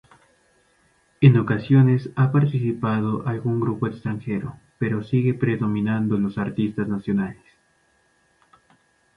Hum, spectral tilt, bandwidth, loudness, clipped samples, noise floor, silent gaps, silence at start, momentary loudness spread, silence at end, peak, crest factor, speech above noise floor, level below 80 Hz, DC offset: none; -10 dB/octave; 5.2 kHz; -22 LUFS; under 0.1%; -63 dBFS; none; 1.2 s; 11 LU; 1.85 s; -2 dBFS; 20 dB; 43 dB; -56 dBFS; under 0.1%